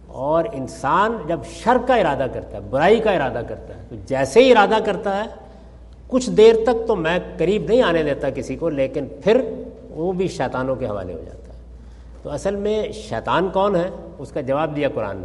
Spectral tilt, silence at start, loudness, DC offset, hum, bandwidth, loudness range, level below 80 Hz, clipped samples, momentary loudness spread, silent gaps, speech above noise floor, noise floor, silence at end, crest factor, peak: -5.5 dB/octave; 0 s; -19 LUFS; under 0.1%; none; 11.5 kHz; 7 LU; -42 dBFS; under 0.1%; 16 LU; none; 22 dB; -41 dBFS; 0 s; 20 dB; 0 dBFS